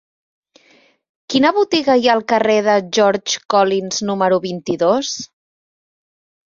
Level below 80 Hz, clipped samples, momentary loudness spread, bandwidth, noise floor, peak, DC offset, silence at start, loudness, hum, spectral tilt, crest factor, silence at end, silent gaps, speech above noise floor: -62 dBFS; under 0.1%; 7 LU; 7.6 kHz; -54 dBFS; -2 dBFS; under 0.1%; 1.3 s; -16 LUFS; none; -3.5 dB/octave; 16 dB; 1.25 s; none; 38 dB